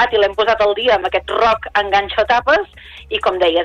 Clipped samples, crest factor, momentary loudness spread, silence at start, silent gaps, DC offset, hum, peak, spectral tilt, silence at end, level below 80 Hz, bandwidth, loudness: under 0.1%; 14 dB; 5 LU; 0 s; none; under 0.1%; none; -2 dBFS; -4 dB/octave; 0 s; -40 dBFS; 9.8 kHz; -15 LUFS